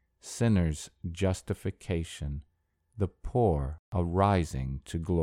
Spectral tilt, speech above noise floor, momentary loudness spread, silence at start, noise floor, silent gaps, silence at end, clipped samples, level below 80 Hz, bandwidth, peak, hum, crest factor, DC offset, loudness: -7 dB/octave; 41 dB; 12 LU; 0.25 s; -70 dBFS; 3.79-3.92 s; 0 s; under 0.1%; -42 dBFS; 13.5 kHz; -12 dBFS; none; 18 dB; under 0.1%; -31 LUFS